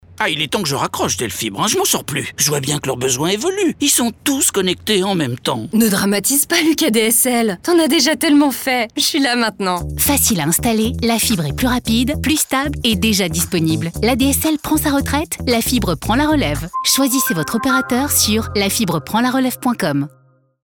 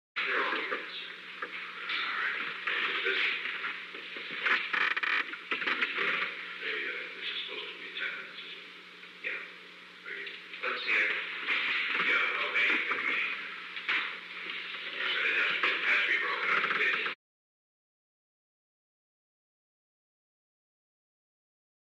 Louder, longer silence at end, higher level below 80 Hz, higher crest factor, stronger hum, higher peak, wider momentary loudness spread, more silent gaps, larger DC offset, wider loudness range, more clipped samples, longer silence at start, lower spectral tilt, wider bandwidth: first, -16 LUFS vs -30 LUFS; second, 0.55 s vs 4.8 s; first, -36 dBFS vs under -90 dBFS; about the same, 14 dB vs 18 dB; neither; first, -2 dBFS vs -16 dBFS; second, 6 LU vs 13 LU; neither; neither; second, 3 LU vs 8 LU; neither; about the same, 0.1 s vs 0.15 s; first, -3.5 dB/octave vs -2 dB/octave; first, over 20 kHz vs 13 kHz